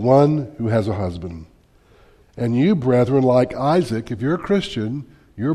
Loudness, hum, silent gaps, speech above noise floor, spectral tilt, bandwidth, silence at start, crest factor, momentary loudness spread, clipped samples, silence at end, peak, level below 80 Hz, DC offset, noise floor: -19 LUFS; none; none; 34 dB; -8 dB/octave; 12 kHz; 0 s; 18 dB; 14 LU; under 0.1%; 0 s; -2 dBFS; -48 dBFS; under 0.1%; -53 dBFS